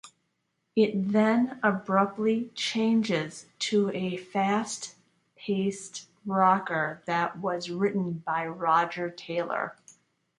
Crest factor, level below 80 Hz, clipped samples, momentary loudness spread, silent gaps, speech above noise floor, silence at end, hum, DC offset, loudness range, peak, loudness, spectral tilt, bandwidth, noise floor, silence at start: 20 dB; -74 dBFS; under 0.1%; 11 LU; none; 50 dB; 0.5 s; none; under 0.1%; 3 LU; -8 dBFS; -28 LUFS; -5 dB/octave; 11.5 kHz; -77 dBFS; 0.05 s